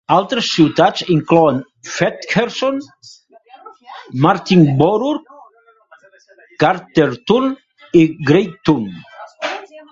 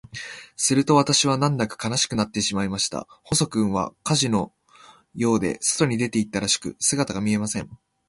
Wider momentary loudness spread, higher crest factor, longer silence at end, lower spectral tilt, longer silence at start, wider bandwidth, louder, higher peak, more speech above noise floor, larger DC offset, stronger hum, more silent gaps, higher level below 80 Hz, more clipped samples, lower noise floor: first, 15 LU vs 12 LU; about the same, 16 dB vs 20 dB; second, 0.1 s vs 0.35 s; first, -6 dB/octave vs -4 dB/octave; about the same, 0.1 s vs 0.15 s; second, 7.6 kHz vs 11.5 kHz; first, -15 LUFS vs -22 LUFS; first, 0 dBFS vs -4 dBFS; first, 35 dB vs 29 dB; neither; neither; neither; about the same, -54 dBFS vs -52 dBFS; neither; about the same, -49 dBFS vs -52 dBFS